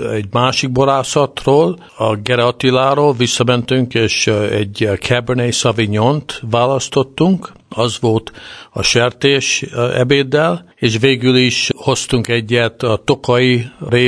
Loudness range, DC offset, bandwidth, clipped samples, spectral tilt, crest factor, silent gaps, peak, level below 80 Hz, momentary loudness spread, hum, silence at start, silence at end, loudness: 2 LU; under 0.1%; 11 kHz; under 0.1%; -4.5 dB/octave; 14 dB; none; 0 dBFS; -44 dBFS; 6 LU; none; 0 s; 0 s; -14 LUFS